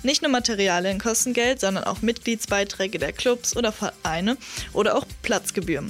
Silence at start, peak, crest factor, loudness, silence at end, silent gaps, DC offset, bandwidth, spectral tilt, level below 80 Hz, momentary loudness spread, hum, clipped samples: 0 s; -8 dBFS; 16 dB; -23 LUFS; 0 s; none; under 0.1%; 16 kHz; -3 dB/octave; -46 dBFS; 5 LU; none; under 0.1%